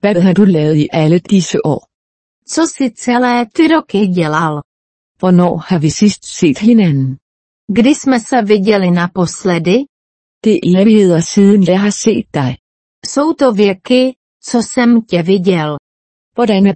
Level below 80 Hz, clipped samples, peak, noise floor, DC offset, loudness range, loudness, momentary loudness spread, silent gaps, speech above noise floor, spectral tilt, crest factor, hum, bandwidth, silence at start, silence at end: -50 dBFS; under 0.1%; 0 dBFS; under -90 dBFS; under 0.1%; 3 LU; -12 LUFS; 9 LU; 1.94-2.42 s, 4.65-5.15 s, 7.22-7.68 s, 9.89-10.41 s, 12.59-13.02 s, 14.16-14.40 s, 15.79-16.32 s; over 79 dB; -6 dB/octave; 12 dB; none; 8.8 kHz; 0 s; 0 s